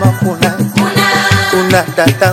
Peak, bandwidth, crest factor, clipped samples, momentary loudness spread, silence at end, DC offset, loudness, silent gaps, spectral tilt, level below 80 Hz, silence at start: 0 dBFS; 17 kHz; 10 dB; under 0.1%; 3 LU; 0 s; under 0.1%; -11 LUFS; none; -5 dB/octave; -40 dBFS; 0 s